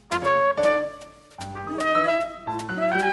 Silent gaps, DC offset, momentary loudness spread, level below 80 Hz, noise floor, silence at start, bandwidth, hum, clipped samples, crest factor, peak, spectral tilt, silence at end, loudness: none; under 0.1%; 15 LU; -56 dBFS; -43 dBFS; 0.1 s; 11.5 kHz; none; under 0.1%; 16 dB; -8 dBFS; -4.5 dB/octave; 0 s; -23 LUFS